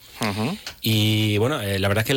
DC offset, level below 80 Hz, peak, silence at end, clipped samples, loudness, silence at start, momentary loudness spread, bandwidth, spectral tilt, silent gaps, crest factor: under 0.1%; -54 dBFS; -12 dBFS; 0 s; under 0.1%; -22 LUFS; 0.05 s; 7 LU; 17 kHz; -5 dB/octave; none; 10 dB